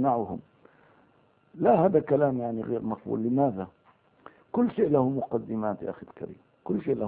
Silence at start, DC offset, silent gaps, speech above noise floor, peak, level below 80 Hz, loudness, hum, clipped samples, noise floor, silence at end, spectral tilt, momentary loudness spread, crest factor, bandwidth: 0 s; under 0.1%; none; 37 dB; -10 dBFS; -64 dBFS; -27 LUFS; none; under 0.1%; -64 dBFS; 0 s; -12.5 dB/octave; 18 LU; 18 dB; 4.1 kHz